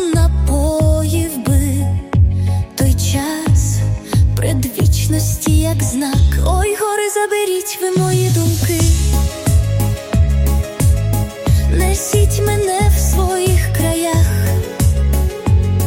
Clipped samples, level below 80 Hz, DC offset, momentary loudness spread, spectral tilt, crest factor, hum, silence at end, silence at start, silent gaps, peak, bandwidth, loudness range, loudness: under 0.1%; -20 dBFS; under 0.1%; 3 LU; -5.5 dB/octave; 12 dB; none; 0 s; 0 s; none; -2 dBFS; 17 kHz; 1 LU; -15 LUFS